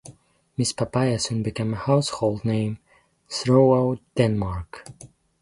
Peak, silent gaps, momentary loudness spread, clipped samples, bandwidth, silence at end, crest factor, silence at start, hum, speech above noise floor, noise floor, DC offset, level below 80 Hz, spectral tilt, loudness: -4 dBFS; none; 17 LU; under 0.1%; 11.5 kHz; 0.35 s; 20 dB; 0.05 s; none; 28 dB; -50 dBFS; under 0.1%; -48 dBFS; -6 dB/octave; -23 LUFS